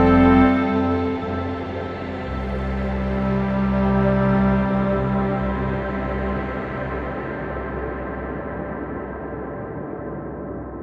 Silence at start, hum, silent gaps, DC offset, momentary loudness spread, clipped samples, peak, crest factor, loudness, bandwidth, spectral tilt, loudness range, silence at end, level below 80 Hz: 0 s; none; none; under 0.1%; 12 LU; under 0.1%; -4 dBFS; 18 dB; -23 LUFS; 5.6 kHz; -9.5 dB/octave; 8 LU; 0 s; -32 dBFS